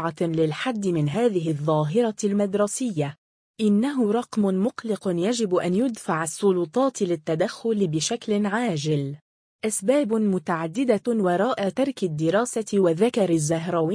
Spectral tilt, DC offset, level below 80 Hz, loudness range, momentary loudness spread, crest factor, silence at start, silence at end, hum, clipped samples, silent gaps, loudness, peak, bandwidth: -5.5 dB/octave; under 0.1%; -66 dBFS; 2 LU; 5 LU; 16 dB; 0 s; 0 s; none; under 0.1%; 3.18-3.54 s, 9.21-9.59 s; -24 LUFS; -8 dBFS; 10.5 kHz